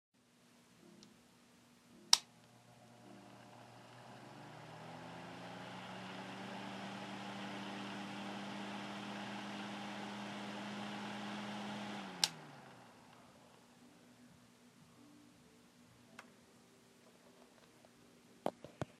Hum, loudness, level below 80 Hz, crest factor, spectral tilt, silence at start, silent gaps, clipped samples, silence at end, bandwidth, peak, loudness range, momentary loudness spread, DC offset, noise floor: none; -43 LUFS; -84 dBFS; 42 dB; -2.5 dB/octave; 0.35 s; none; under 0.1%; 0 s; 15 kHz; -6 dBFS; 22 LU; 19 LU; under 0.1%; -68 dBFS